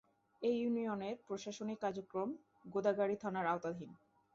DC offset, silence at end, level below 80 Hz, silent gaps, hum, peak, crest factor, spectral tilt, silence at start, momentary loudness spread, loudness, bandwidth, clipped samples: under 0.1%; 0.4 s; -80 dBFS; none; none; -22 dBFS; 18 dB; -5 dB/octave; 0.4 s; 9 LU; -40 LUFS; 7.6 kHz; under 0.1%